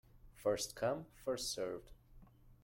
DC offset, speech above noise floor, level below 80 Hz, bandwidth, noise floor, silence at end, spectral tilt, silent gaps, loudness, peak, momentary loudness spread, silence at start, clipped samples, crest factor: under 0.1%; 22 dB; -64 dBFS; 16.5 kHz; -62 dBFS; 0.1 s; -3.5 dB/octave; none; -41 LUFS; -24 dBFS; 6 LU; 0.15 s; under 0.1%; 20 dB